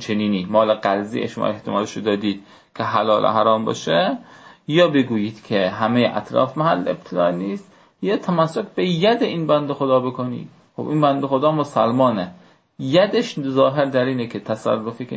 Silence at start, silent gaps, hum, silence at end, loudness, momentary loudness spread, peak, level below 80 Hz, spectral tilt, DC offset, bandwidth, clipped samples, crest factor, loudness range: 0 s; none; none; 0 s; -20 LUFS; 10 LU; -2 dBFS; -62 dBFS; -6.5 dB/octave; under 0.1%; 8 kHz; under 0.1%; 16 dB; 2 LU